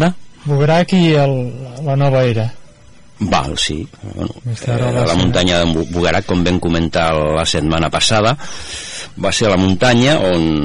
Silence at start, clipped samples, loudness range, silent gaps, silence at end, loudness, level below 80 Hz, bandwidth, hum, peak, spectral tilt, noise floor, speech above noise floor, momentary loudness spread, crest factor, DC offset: 0 s; under 0.1%; 4 LU; none; 0 s; -15 LUFS; -36 dBFS; 11 kHz; none; -2 dBFS; -5 dB/octave; -43 dBFS; 29 dB; 13 LU; 14 dB; under 0.1%